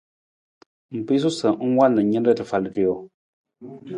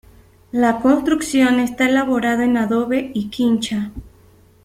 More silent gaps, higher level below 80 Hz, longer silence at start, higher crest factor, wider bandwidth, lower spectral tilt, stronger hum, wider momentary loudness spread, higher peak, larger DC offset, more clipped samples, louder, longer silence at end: first, 3.14-3.44 s vs none; second, -62 dBFS vs -48 dBFS; first, 0.9 s vs 0.55 s; about the same, 18 dB vs 16 dB; second, 11 kHz vs 15 kHz; first, -6.5 dB/octave vs -4.5 dB/octave; neither; first, 16 LU vs 9 LU; about the same, -4 dBFS vs -2 dBFS; neither; neither; second, -21 LUFS vs -18 LUFS; second, 0 s vs 0.55 s